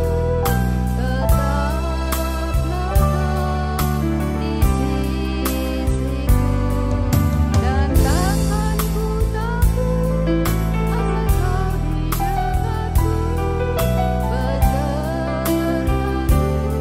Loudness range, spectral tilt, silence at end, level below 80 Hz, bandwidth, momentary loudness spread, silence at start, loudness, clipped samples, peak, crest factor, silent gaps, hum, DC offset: 2 LU; -6.5 dB/octave; 0 s; -22 dBFS; 16.5 kHz; 4 LU; 0 s; -20 LUFS; under 0.1%; -4 dBFS; 14 dB; none; none; under 0.1%